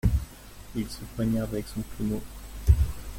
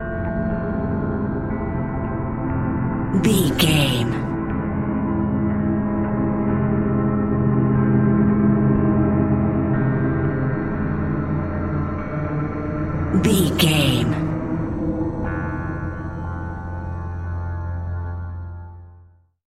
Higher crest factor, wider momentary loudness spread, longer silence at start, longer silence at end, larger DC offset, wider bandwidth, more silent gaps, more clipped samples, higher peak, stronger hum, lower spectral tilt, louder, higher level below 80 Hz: about the same, 20 dB vs 18 dB; first, 15 LU vs 12 LU; about the same, 0.05 s vs 0 s; second, 0 s vs 0.45 s; neither; about the same, 16.5 kHz vs 16 kHz; neither; neither; second, -6 dBFS vs -2 dBFS; neither; about the same, -7 dB/octave vs -6.5 dB/octave; second, -30 LUFS vs -21 LUFS; about the same, -32 dBFS vs -34 dBFS